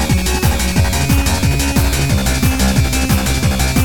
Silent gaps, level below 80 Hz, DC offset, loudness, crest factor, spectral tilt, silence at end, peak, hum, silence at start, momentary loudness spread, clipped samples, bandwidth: none; -18 dBFS; 3%; -15 LUFS; 12 dB; -4.5 dB/octave; 0 s; -2 dBFS; none; 0 s; 1 LU; under 0.1%; 19.5 kHz